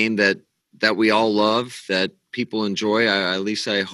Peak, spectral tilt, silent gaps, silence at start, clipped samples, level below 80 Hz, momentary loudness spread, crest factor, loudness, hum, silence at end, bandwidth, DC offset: -2 dBFS; -4 dB/octave; none; 0 s; under 0.1%; -72 dBFS; 8 LU; 18 dB; -20 LUFS; none; 0 s; 12.5 kHz; under 0.1%